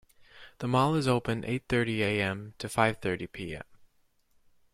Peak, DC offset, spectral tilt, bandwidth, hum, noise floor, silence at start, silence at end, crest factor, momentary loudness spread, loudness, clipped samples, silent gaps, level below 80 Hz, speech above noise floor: -10 dBFS; under 0.1%; -6 dB/octave; 15.5 kHz; none; -68 dBFS; 0.35 s; 0.9 s; 22 dB; 12 LU; -29 LUFS; under 0.1%; none; -56 dBFS; 39 dB